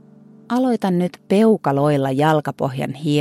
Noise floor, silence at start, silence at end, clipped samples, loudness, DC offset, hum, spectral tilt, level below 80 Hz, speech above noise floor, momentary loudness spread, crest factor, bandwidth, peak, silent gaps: -46 dBFS; 0.5 s; 0 s; under 0.1%; -19 LUFS; under 0.1%; none; -7.5 dB/octave; -60 dBFS; 28 dB; 8 LU; 14 dB; 15 kHz; -4 dBFS; none